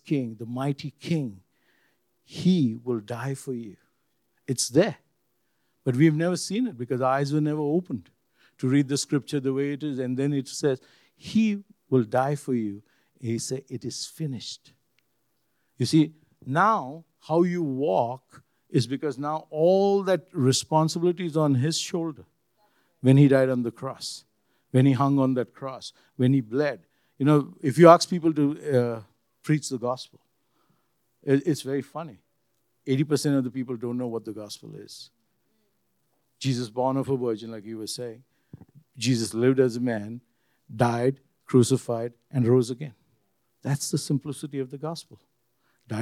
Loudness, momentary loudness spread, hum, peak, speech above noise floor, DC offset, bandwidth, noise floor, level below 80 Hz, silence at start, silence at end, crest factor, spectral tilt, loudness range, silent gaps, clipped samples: -25 LUFS; 16 LU; none; 0 dBFS; 50 dB; under 0.1%; 14 kHz; -74 dBFS; -76 dBFS; 0.05 s; 0 s; 26 dB; -6 dB/octave; 9 LU; none; under 0.1%